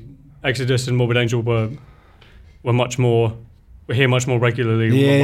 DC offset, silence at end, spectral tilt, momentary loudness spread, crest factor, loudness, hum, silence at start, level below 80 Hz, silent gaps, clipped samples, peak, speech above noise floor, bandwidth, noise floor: under 0.1%; 0 s; -6 dB/octave; 9 LU; 18 dB; -19 LUFS; none; 0 s; -48 dBFS; none; under 0.1%; 0 dBFS; 29 dB; 12.5 kHz; -46 dBFS